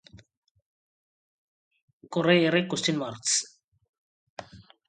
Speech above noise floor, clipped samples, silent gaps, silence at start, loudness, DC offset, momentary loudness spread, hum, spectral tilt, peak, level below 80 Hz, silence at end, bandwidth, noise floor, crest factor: 21 dB; under 0.1%; 3.64-3.72 s, 3.89-4.37 s; 2.1 s; -25 LUFS; under 0.1%; 24 LU; none; -3.5 dB/octave; -8 dBFS; -70 dBFS; 0.25 s; 9.6 kHz; -46 dBFS; 24 dB